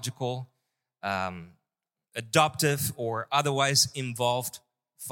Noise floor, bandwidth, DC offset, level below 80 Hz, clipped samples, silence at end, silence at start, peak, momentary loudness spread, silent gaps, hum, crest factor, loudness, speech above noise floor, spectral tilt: -88 dBFS; 17 kHz; under 0.1%; -66 dBFS; under 0.1%; 0 s; 0 s; -6 dBFS; 17 LU; none; none; 24 dB; -27 LUFS; 60 dB; -3 dB/octave